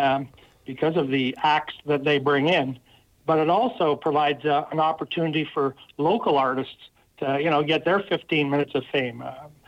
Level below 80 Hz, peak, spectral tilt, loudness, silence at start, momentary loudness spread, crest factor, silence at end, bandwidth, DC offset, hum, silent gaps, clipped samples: -66 dBFS; -10 dBFS; -7 dB/octave; -23 LUFS; 0 s; 10 LU; 14 dB; 0.2 s; 8.8 kHz; under 0.1%; none; none; under 0.1%